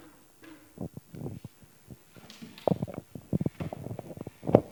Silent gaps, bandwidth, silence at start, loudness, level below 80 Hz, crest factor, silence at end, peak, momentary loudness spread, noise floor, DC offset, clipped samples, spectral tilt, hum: none; 19.5 kHz; 0 s; -34 LUFS; -58 dBFS; 34 dB; 0 s; 0 dBFS; 21 LU; -54 dBFS; under 0.1%; under 0.1%; -8.5 dB/octave; none